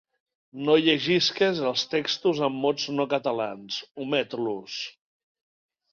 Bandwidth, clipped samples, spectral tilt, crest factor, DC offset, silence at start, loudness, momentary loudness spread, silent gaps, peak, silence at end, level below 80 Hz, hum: 7.2 kHz; under 0.1%; -4.5 dB/octave; 20 dB; under 0.1%; 0.55 s; -25 LUFS; 12 LU; 3.91-3.95 s; -6 dBFS; 1 s; -70 dBFS; none